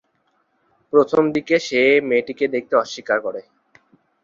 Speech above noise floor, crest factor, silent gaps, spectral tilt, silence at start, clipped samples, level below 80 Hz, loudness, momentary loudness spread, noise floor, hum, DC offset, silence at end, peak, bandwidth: 48 dB; 18 dB; none; -4.5 dB/octave; 0.95 s; under 0.1%; -64 dBFS; -19 LUFS; 7 LU; -66 dBFS; none; under 0.1%; 0.85 s; -4 dBFS; 7.6 kHz